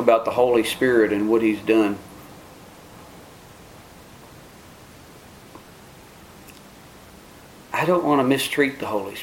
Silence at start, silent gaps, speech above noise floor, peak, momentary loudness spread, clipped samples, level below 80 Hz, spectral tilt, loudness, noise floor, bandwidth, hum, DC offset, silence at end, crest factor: 0 s; none; 26 dB; -2 dBFS; 25 LU; under 0.1%; -56 dBFS; -5 dB/octave; -20 LUFS; -45 dBFS; 17 kHz; none; under 0.1%; 0 s; 22 dB